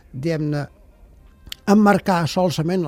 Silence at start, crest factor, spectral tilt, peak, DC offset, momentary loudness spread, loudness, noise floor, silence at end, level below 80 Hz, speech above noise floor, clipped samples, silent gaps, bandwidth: 0.15 s; 18 dB; -6.5 dB/octave; -2 dBFS; under 0.1%; 15 LU; -19 LUFS; -48 dBFS; 0 s; -48 dBFS; 30 dB; under 0.1%; none; 15.5 kHz